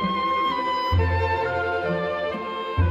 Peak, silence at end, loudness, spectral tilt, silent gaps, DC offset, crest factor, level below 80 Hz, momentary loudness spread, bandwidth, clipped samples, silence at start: -10 dBFS; 0 s; -24 LUFS; -7.5 dB/octave; none; under 0.1%; 12 dB; -36 dBFS; 5 LU; 7.4 kHz; under 0.1%; 0 s